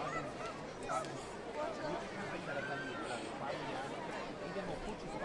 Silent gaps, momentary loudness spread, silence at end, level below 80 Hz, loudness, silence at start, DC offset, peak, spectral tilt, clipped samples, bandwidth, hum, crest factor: none; 4 LU; 0 s; -60 dBFS; -42 LUFS; 0 s; under 0.1%; -26 dBFS; -4.5 dB/octave; under 0.1%; 11.5 kHz; none; 16 dB